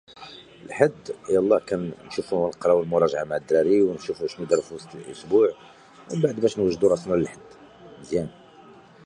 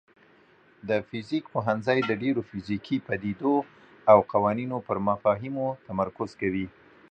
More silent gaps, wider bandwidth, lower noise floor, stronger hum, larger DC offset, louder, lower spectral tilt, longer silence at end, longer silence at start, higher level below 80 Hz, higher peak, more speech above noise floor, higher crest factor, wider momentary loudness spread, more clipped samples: neither; first, 10.5 kHz vs 8.6 kHz; second, -49 dBFS vs -59 dBFS; neither; neither; first, -23 LUFS vs -27 LUFS; second, -6.5 dB/octave vs -8 dB/octave; first, 0.75 s vs 0.4 s; second, 0.2 s vs 0.85 s; about the same, -58 dBFS vs -60 dBFS; about the same, -4 dBFS vs -4 dBFS; second, 26 dB vs 33 dB; about the same, 20 dB vs 22 dB; first, 18 LU vs 11 LU; neither